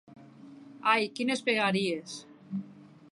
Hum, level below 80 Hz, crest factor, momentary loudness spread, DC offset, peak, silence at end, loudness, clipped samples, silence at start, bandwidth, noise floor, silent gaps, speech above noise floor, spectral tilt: none; -80 dBFS; 22 dB; 17 LU; under 0.1%; -10 dBFS; 0.25 s; -29 LUFS; under 0.1%; 0.1 s; 11.5 kHz; -51 dBFS; none; 22 dB; -4.5 dB/octave